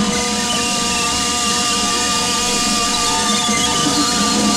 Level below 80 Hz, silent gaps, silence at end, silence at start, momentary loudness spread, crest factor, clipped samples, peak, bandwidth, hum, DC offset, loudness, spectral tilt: -38 dBFS; none; 0 s; 0 s; 2 LU; 14 dB; under 0.1%; -4 dBFS; 16.5 kHz; none; under 0.1%; -15 LUFS; -1.5 dB/octave